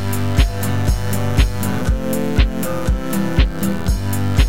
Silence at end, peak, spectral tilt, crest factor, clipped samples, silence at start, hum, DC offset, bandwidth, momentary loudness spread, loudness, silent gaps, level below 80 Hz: 0 s; -2 dBFS; -6 dB/octave; 16 dB; under 0.1%; 0 s; none; 5%; 17 kHz; 3 LU; -19 LUFS; none; -20 dBFS